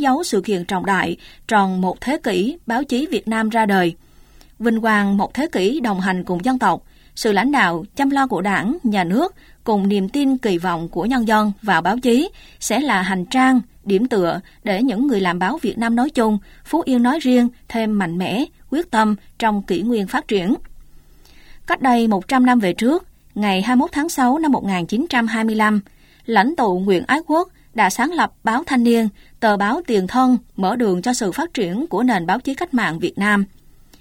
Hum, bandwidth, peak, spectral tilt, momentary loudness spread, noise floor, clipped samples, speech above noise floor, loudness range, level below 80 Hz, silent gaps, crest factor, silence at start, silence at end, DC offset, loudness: none; 16.5 kHz; 0 dBFS; -5.5 dB/octave; 6 LU; -46 dBFS; under 0.1%; 29 dB; 2 LU; -48 dBFS; none; 18 dB; 0 s; 0.55 s; under 0.1%; -18 LUFS